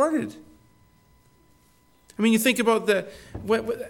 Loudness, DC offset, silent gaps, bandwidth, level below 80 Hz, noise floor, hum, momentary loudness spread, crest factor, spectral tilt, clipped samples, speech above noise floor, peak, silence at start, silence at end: -23 LUFS; under 0.1%; none; 17.5 kHz; -56 dBFS; -60 dBFS; none; 18 LU; 20 dB; -4 dB/octave; under 0.1%; 36 dB; -6 dBFS; 0 s; 0 s